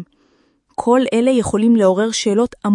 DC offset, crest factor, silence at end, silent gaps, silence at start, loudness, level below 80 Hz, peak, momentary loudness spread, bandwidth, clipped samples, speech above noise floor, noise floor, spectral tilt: under 0.1%; 14 dB; 0 s; none; 0 s; -15 LUFS; -50 dBFS; -2 dBFS; 5 LU; 11 kHz; under 0.1%; 44 dB; -58 dBFS; -5 dB/octave